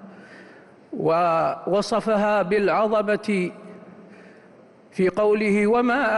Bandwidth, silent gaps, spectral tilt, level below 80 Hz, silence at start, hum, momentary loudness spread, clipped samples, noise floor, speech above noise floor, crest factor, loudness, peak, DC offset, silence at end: 11.5 kHz; none; -6.5 dB/octave; -60 dBFS; 0 s; none; 10 LU; under 0.1%; -50 dBFS; 30 dB; 12 dB; -21 LUFS; -12 dBFS; under 0.1%; 0 s